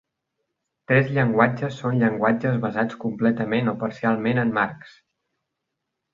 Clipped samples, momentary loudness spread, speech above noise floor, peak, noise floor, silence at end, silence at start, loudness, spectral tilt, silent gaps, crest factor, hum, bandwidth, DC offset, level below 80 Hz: under 0.1%; 6 LU; 59 dB; -4 dBFS; -81 dBFS; 1.25 s; 0.9 s; -22 LUFS; -8.5 dB/octave; none; 20 dB; none; 7.2 kHz; under 0.1%; -60 dBFS